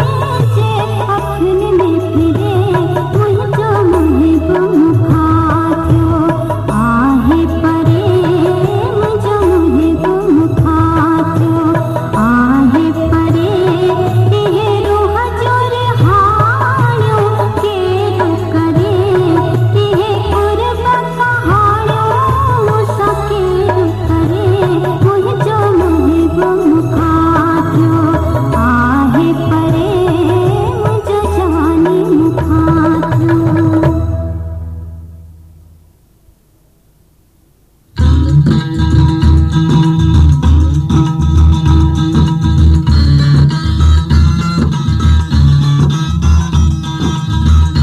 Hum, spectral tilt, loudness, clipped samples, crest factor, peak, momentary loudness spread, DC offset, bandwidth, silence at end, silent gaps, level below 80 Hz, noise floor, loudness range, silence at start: none; -8 dB/octave; -11 LUFS; under 0.1%; 10 dB; 0 dBFS; 4 LU; under 0.1%; 13 kHz; 0 s; none; -20 dBFS; -49 dBFS; 2 LU; 0 s